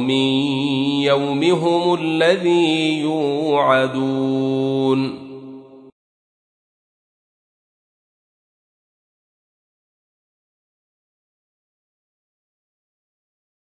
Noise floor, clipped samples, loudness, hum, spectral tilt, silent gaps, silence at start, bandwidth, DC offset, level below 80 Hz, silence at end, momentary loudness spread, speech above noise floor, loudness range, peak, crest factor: -39 dBFS; under 0.1%; -18 LUFS; none; -6 dB/octave; none; 0 s; 10 kHz; under 0.1%; -68 dBFS; 7.95 s; 5 LU; 21 dB; 9 LU; -2 dBFS; 20 dB